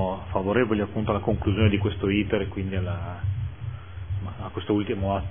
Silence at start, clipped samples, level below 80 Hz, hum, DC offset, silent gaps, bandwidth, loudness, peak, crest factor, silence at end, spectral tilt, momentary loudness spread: 0 s; under 0.1%; -40 dBFS; none; 0.5%; none; 3.6 kHz; -26 LUFS; -6 dBFS; 20 dB; 0 s; -11.5 dB/octave; 11 LU